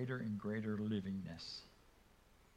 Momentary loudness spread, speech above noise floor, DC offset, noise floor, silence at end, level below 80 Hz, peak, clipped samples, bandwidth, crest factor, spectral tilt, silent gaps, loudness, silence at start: 10 LU; 25 dB; under 0.1%; -68 dBFS; 0.65 s; -70 dBFS; -28 dBFS; under 0.1%; 11 kHz; 16 dB; -7 dB/octave; none; -43 LUFS; 0 s